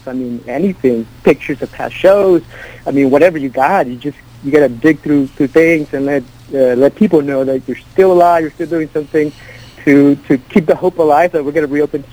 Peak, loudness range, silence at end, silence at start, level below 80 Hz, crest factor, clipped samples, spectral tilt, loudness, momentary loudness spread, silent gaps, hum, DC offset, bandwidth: 0 dBFS; 1 LU; 0.1 s; 0.05 s; -44 dBFS; 12 dB; 0.2%; -7.5 dB/octave; -13 LUFS; 11 LU; none; none; under 0.1%; over 20 kHz